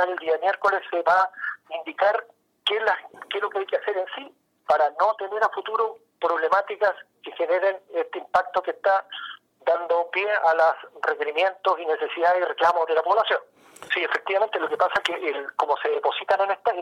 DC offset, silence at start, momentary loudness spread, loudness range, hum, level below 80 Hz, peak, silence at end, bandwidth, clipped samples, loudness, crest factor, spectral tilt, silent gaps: under 0.1%; 0 s; 8 LU; 3 LU; none; -70 dBFS; -10 dBFS; 0 s; 12 kHz; under 0.1%; -24 LUFS; 14 dB; -2.5 dB/octave; none